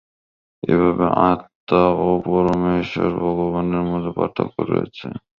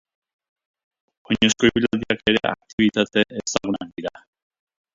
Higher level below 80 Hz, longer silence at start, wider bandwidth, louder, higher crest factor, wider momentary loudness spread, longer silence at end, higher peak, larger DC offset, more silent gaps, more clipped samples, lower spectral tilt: first, -44 dBFS vs -50 dBFS; second, 0.65 s vs 1.3 s; second, 6.8 kHz vs 7.8 kHz; about the same, -19 LUFS vs -21 LUFS; about the same, 18 dB vs 22 dB; second, 7 LU vs 10 LU; second, 0.2 s vs 0.85 s; about the same, -2 dBFS vs -2 dBFS; neither; first, 1.55-1.67 s vs 2.73-2.78 s; neither; first, -9 dB/octave vs -3.5 dB/octave